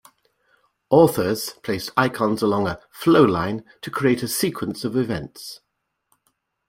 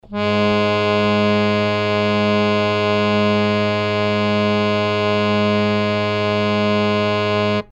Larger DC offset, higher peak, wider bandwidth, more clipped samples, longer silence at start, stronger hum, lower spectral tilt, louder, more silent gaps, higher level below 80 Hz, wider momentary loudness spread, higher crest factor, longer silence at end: neither; about the same, -2 dBFS vs -4 dBFS; first, 16.5 kHz vs 8.4 kHz; neither; first, 0.9 s vs 0.1 s; neither; about the same, -5.5 dB/octave vs -6.5 dB/octave; second, -21 LUFS vs -17 LUFS; neither; about the same, -54 dBFS vs -50 dBFS; first, 14 LU vs 2 LU; first, 20 dB vs 14 dB; first, 1.1 s vs 0.1 s